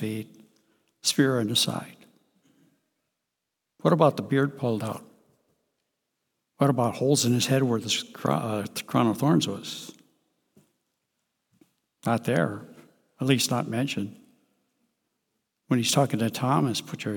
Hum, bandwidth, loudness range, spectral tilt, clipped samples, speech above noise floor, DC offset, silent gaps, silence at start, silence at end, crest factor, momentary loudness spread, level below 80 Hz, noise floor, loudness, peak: none; 19 kHz; 5 LU; -5 dB/octave; under 0.1%; 59 dB; under 0.1%; none; 0 s; 0 s; 22 dB; 13 LU; -76 dBFS; -84 dBFS; -25 LUFS; -6 dBFS